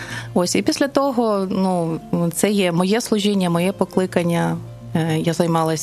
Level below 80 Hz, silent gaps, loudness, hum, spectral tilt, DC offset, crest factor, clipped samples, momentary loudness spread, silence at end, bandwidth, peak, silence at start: -54 dBFS; none; -20 LUFS; none; -5.5 dB/octave; under 0.1%; 18 dB; under 0.1%; 5 LU; 0 s; 14 kHz; -2 dBFS; 0 s